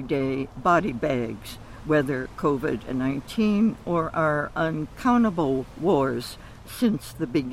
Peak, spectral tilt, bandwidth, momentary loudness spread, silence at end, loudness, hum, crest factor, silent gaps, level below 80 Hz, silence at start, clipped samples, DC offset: -8 dBFS; -7 dB/octave; 15.5 kHz; 10 LU; 0 s; -25 LUFS; none; 16 dB; none; -46 dBFS; 0 s; under 0.1%; under 0.1%